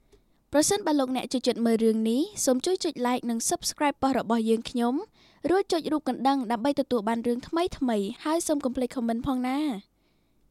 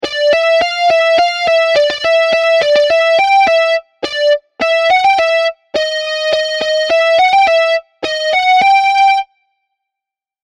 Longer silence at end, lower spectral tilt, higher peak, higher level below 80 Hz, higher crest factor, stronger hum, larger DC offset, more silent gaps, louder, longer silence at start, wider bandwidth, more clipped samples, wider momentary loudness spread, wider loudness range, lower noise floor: second, 0.7 s vs 1.2 s; first, -3.5 dB/octave vs -1 dB/octave; second, -8 dBFS vs -2 dBFS; about the same, -56 dBFS vs -52 dBFS; first, 18 dB vs 10 dB; neither; neither; neither; second, -27 LUFS vs -11 LUFS; first, 0.5 s vs 0 s; first, 15.5 kHz vs 12 kHz; neither; about the same, 5 LU vs 7 LU; about the same, 2 LU vs 2 LU; second, -67 dBFS vs -84 dBFS